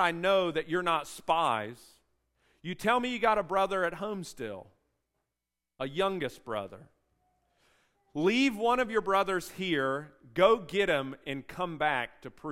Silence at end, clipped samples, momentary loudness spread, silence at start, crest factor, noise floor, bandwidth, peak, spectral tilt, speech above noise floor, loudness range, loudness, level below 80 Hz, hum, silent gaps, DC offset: 0 s; under 0.1%; 14 LU; 0 s; 22 dB; -88 dBFS; 16 kHz; -10 dBFS; -4.5 dB/octave; 58 dB; 9 LU; -30 LUFS; -62 dBFS; none; none; under 0.1%